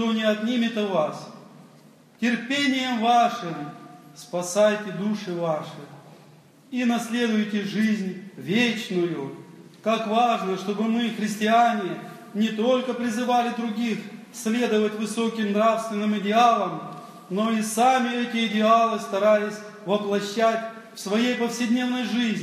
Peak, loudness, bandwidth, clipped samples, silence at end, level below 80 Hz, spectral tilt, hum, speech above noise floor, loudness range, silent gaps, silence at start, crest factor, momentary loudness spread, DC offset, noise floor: -6 dBFS; -24 LUFS; 14.5 kHz; under 0.1%; 0 s; -80 dBFS; -4.5 dB/octave; none; 29 dB; 4 LU; none; 0 s; 18 dB; 13 LU; under 0.1%; -52 dBFS